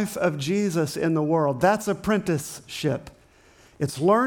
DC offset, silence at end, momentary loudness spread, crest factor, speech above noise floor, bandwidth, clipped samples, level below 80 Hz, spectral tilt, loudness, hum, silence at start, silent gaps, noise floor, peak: under 0.1%; 0 s; 9 LU; 16 dB; 31 dB; 19 kHz; under 0.1%; -56 dBFS; -6 dB/octave; -24 LUFS; none; 0 s; none; -55 dBFS; -8 dBFS